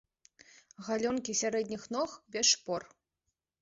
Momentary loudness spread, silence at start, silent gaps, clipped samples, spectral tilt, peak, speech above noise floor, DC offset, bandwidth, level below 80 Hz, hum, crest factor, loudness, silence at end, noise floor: 12 LU; 0.8 s; none; under 0.1%; -1.5 dB/octave; -14 dBFS; 53 dB; under 0.1%; 8 kHz; -72 dBFS; none; 22 dB; -32 LUFS; 0.75 s; -86 dBFS